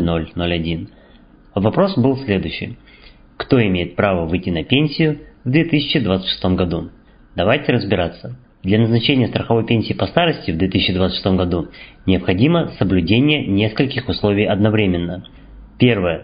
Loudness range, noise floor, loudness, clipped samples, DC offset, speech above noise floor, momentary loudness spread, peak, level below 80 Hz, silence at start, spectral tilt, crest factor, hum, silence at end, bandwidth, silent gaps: 2 LU; -46 dBFS; -17 LUFS; under 0.1%; under 0.1%; 29 dB; 11 LU; 0 dBFS; -36 dBFS; 0 s; -11.5 dB/octave; 18 dB; none; 0 s; 5.2 kHz; none